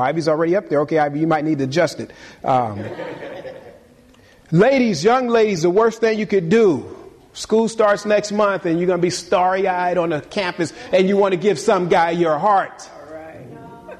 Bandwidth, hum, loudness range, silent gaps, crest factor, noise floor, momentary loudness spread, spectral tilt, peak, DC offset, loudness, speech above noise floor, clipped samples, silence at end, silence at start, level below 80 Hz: 12.5 kHz; none; 4 LU; none; 14 dB; -49 dBFS; 19 LU; -5.5 dB/octave; -4 dBFS; under 0.1%; -18 LUFS; 32 dB; under 0.1%; 0.05 s; 0 s; -56 dBFS